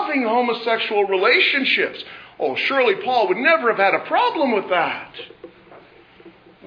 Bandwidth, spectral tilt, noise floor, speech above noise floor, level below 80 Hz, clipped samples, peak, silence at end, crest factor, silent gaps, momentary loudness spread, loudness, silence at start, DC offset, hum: 5.4 kHz; -5 dB/octave; -47 dBFS; 28 dB; -70 dBFS; under 0.1%; -4 dBFS; 0 s; 16 dB; none; 14 LU; -18 LUFS; 0 s; under 0.1%; none